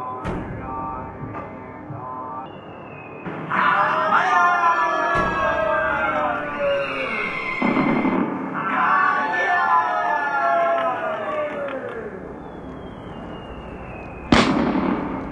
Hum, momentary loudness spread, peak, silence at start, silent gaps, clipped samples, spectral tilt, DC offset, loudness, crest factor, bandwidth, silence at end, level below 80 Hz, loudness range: none; 18 LU; 0 dBFS; 0 s; none; under 0.1%; -5.5 dB/octave; under 0.1%; -21 LUFS; 22 dB; 11 kHz; 0 s; -44 dBFS; 9 LU